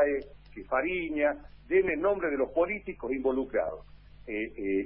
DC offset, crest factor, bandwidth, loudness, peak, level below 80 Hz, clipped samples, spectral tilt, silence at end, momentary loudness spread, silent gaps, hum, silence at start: under 0.1%; 16 dB; 5.2 kHz; -30 LUFS; -14 dBFS; -54 dBFS; under 0.1%; -9.5 dB/octave; 0 s; 13 LU; none; none; 0 s